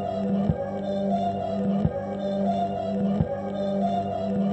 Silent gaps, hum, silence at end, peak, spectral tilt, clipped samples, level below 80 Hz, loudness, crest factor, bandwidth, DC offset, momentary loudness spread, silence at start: none; 50 Hz at -40 dBFS; 0 s; -8 dBFS; -9 dB/octave; under 0.1%; -46 dBFS; -27 LUFS; 18 dB; 8.2 kHz; under 0.1%; 3 LU; 0 s